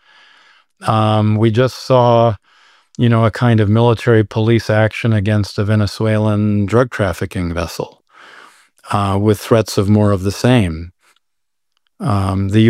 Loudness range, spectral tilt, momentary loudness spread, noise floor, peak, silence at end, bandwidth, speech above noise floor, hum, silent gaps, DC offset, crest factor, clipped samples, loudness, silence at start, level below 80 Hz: 4 LU; -7 dB/octave; 9 LU; -79 dBFS; -2 dBFS; 0 s; 14 kHz; 66 dB; none; none; under 0.1%; 14 dB; under 0.1%; -15 LUFS; 0.8 s; -42 dBFS